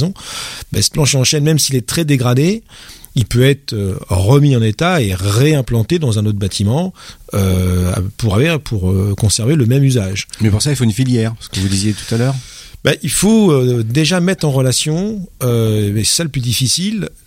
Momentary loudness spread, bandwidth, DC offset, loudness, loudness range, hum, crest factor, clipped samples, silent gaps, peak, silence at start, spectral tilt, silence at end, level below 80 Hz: 8 LU; 16.5 kHz; under 0.1%; -14 LUFS; 2 LU; none; 14 dB; under 0.1%; none; 0 dBFS; 0 s; -5 dB/octave; 0.2 s; -36 dBFS